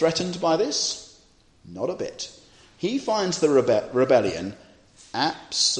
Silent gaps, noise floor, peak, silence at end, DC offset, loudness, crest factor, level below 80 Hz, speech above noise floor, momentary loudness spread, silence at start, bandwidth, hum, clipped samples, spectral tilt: none; -57 dBFS; -6 dBFS; 0 s; under 0.1%; -24 LUFS; 18 dB; -60 dBFS; 34 dB; 14 LU; 0 s; 10 kHz; none; under 0.1%; -3.5 dB/octave